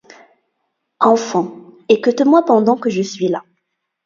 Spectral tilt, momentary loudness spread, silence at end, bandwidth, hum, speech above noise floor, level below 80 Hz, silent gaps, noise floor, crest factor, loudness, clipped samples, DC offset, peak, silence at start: -5.5 dB/octave; 11 LU; 0.65 s; 7.6 kHz; none; 59 dB; -66 dBFS; none; -73 dBFS; 16 dB; -15 LUFS; under 0.1%; under 0.1%; 0 dBFS; 1 s